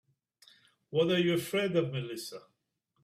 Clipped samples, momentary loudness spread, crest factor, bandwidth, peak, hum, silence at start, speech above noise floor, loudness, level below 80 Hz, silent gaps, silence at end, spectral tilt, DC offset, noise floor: under 0.1%; 15 LU; 18 dB; 16 kHz; -16 dBFS; none; 0.9 s; 49 dB; -31 LUFS; -74 dBFS; none; 0.65 s; -5.5 dB/octave; under 0.1%; -79 dBFS